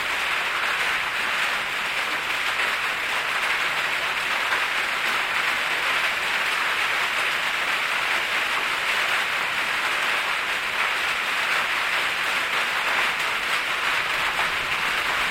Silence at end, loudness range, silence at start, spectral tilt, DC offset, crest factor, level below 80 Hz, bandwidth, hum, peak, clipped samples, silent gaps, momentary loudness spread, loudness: 0 s; 1 LU; 0 s; 0 dB/octave; under 0.1%; 14 dB; -56 dBFS; 16.5 kHz; none; -10 dBFS; under 0.1%; none; 2 LU; -22 LUFS